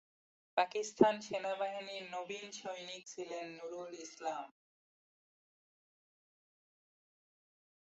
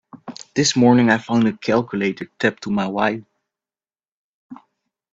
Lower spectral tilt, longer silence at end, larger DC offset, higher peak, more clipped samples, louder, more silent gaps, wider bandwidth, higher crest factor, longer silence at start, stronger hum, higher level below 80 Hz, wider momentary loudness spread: second, -3 dB/octave vs -5 dB/octave; first, 3.35 s vs 0.55 s; neither; second, -12 dBFS vs 0 dBFS; neither; second, -39 LUFS vs -19 LUFS; second, none vs 4.08-4.49 s; about the same, 8 kHz vs 8 kHz; first, 28 dB vs 20 dB; first, 0.55 s vs 0.15 s; neither; second, -82 dBFS vs -60 dBFS; first, 15 LU vs 12 LU